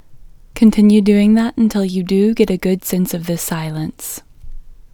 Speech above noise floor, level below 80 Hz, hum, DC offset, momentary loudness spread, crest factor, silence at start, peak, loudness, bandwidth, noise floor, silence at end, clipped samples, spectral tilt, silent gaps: 24 dB; -38 dBFS; none; under 0.1%; 14 LU; 16 dB; 0.1 s; 0 dBFS; -15 LUFS; 19 kHz; -38 dBFS; 0.05 s; under 0.1%; -6.5 dB/octave; none